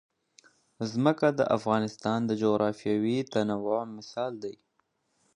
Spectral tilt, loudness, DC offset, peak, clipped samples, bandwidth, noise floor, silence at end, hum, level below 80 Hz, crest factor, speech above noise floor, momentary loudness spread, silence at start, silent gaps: -6.5 dB/octave; -28 LUFS; under 0.1%; -8 dBFS; under 0.1%; 10.5 kHz; -75 dBFS; 0.8 s; none; -70 dBFS; 22 dB; 47 dB; 10 LU; 0.8 s; none